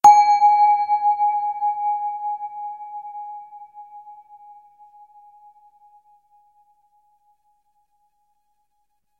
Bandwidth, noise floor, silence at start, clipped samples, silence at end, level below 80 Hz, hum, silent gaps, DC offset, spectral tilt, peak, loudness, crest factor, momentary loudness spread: 11 kHz; -73 dBFS; 0.05 s; under 0.1%; 5.05 s; -68 dBFS; none; none; under 0.1%; -1 dB/octave; 0 dBFS; -19 LUFS; 22 dB; 27 LU